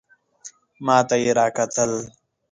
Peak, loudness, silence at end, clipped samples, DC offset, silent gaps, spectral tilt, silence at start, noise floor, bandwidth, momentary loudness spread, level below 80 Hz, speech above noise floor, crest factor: -2 dBFS; -20 LUFS; 0.45 s; under 0.1%; under 0.1%; none; -4 dB/octave; 0.45 s; -46 dBFS; 10 kHz; 24 LU; -62 dBFS; 26 dB; 20 dB